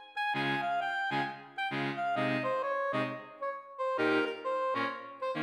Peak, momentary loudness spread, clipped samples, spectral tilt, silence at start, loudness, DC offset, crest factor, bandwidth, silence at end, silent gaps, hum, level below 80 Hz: -18 dBFS; 8 LU; under 0.1%; -6 dB/octave; 0 s; -33 LUFS; under 0.1%; 16 dB; 12.5 kHz; 0 s; none; none; -88 dBFS